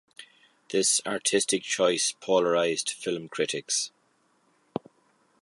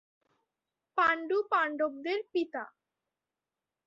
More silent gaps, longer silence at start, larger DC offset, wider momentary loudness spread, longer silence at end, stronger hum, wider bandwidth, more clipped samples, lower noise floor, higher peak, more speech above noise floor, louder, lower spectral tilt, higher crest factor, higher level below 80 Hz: neither; second, 0.2 s vs 0.95 s; neither; first, 13 LU vs 10 LU; first, 1.55 s vs 1.2 s; neither; first, 12 kHz vs 7.6 kHz; neither; second, -68 dBFS vs under -90 dBFS; first, -10 dBFS vs -14 dBFS; second, 41 dB vs over 59 dB; first, -26 LUFS vs -31 LUFS; second, -2 dB/octave vs -4 dB/octave; about the same, 20 dB vs 20 dB; about the same, -76 dBFS vs -80 dBFS